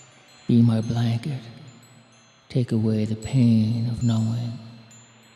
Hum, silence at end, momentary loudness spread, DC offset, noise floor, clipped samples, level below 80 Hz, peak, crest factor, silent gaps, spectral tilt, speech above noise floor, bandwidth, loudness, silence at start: none; 0.55 s; 17 LU; under 0.1%; -54 dBFS; under 0.1%; -54 dBFS; -8 dBFS; 16 dB; none; -8 dB/octave; 33 dB; 10.5 kHz; -23 LUFS; 0.5 s